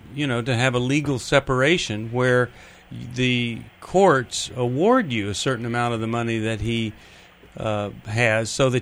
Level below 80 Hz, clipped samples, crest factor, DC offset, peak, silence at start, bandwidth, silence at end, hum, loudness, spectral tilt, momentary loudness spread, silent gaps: -48 dBFS; under 0.1%; 18 dB; under 0.1%; -4 dBFS; 0.05 s; 13.5 kHz; 0 s; none; -22 LUFS; -5 dB/octave; 10 LU; none